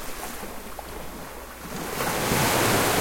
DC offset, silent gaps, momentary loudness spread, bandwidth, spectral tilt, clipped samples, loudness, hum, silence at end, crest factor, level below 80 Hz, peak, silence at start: 0.1%; none; 17 LU; 16.5 kHz; -3 dB/octave; under 0.1%; -25 LUFS; none; 0 s; 18 dB; -44 dBFS; -8 dBFS; 0 s